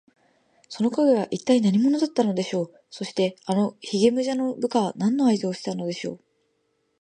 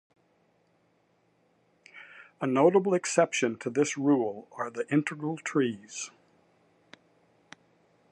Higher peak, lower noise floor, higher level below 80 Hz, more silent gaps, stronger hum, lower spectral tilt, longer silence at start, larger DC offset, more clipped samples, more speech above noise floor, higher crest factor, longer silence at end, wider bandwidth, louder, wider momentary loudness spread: first, -6 dBFS vs -10 dBFS; about the same, -71 dBFS vs -69 dBFS; first, -72 dBFS vs -82 dBFS; neither; neither; about the same, -6 dB/octave vs -5 dB/octave; second, 0.7 s vs 1.95 s; neither; neither; first, 48 dB vs 42 dB; about the same, 18 dB vs 22 dB; second, 0.85 s vs 2.05 s; second, 9.8 kHz vs 11.5 kHz; first, -23 LUFS vs -28 LUFS; second, 11 LU vs 18 LU